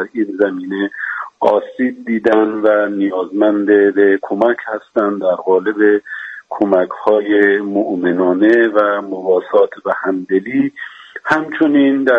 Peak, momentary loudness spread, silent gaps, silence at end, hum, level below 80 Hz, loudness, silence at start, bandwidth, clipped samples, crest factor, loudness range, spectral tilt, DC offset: 0 dBFS; 9 LU; none; 0 s; none; -62 dBFS; -15 LUFS; 0 s; 6.8 kHz; under 0.1%; 14 dB; 2 LU; -7.5 dB/octave; under 0.1%